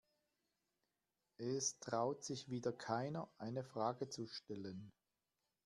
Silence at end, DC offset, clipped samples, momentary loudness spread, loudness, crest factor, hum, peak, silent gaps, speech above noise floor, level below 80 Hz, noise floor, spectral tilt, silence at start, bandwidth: 0.75 s; under 0.1%; under 0.1%; 9 LU; -44 LUFS; 20 dB; none; -26 dBFS; none; over 46 dB; -84 dBFS; under -90 dBFS; -4.5 dB/octave; 1.4 s; 12.5 kHz